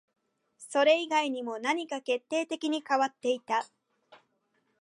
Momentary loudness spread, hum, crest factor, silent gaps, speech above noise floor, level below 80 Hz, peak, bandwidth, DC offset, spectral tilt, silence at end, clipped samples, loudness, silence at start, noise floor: 8 LU; none; 20 dB; none; 46 dB; -88 dBFS; -10 dBFS; 11.5 kHz; under 0.1%; -2 dB/octave; 0.65 s; under 0.1%; -29 LUFS; 0.6 s; -75 dBFS